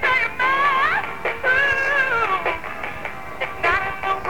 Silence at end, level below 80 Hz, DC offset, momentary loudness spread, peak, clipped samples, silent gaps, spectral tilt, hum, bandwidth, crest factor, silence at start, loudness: 0 s; -46 dBFS; 2%; 12 LU; -6 dBFS; under 0.1%; none; -3.5 dB/octave; none; 19 kHz; 16 dB; 0 s; -20 LUFS